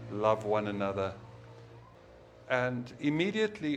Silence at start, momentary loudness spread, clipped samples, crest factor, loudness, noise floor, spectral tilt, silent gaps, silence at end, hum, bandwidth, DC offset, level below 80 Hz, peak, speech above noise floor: 0 s; 22 LU; under 0.1%; 20 dB; -32 LUFS; -55 dBFS; -6.5 dB/octave; none; 0 s; none; 9.6 kHz; under 0.1%; -64 dBFS; -12 dBFS; 24 dB